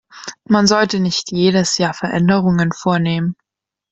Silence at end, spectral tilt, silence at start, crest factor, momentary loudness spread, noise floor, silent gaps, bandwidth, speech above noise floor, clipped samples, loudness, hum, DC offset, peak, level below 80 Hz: 0.6 s; -5 dB/octave; 0.15 s; 16 dB; 10 LU; -84 dBFS; none; 8.2 kHz; 69 dB; under 0.1%; -16 LUFS; none; under 0.1%; 0 dBFS; -52 dBFS